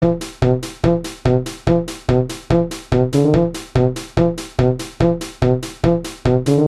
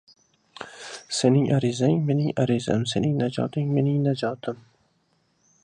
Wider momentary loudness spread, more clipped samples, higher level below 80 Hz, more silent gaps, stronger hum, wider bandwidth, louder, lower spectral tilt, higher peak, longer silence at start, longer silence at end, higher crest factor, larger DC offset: second, 4 LU vs 17 LU; neither; first, -32 dBFS vs -60 dBFS; neither; neither; first, 13.5 kHz vs 10.5 kHz; first, -18 LUFS vs -24 LUFS; about the same, -7 dB/octave vs -6.5 dB/octave; first, 0 dBFS vs -6 dBFS; second, 0 s vs 0.6 s; second, 0 s vs 1.1 s; about the same, 16 dB vs 18 dB; neither